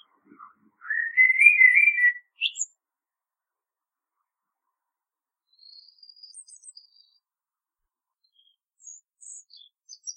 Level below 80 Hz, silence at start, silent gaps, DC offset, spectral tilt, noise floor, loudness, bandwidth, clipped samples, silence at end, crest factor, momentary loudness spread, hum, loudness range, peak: under -90 dBFS; 0.85 s; none; under 0.1%; 5.5 dB/octave; under -90 dBFS; -18 LUFS; 10.5 kHz; under 0.1%; 0.05 s; 24 dB; 20 LU; none; 18 LU; -4 dBFS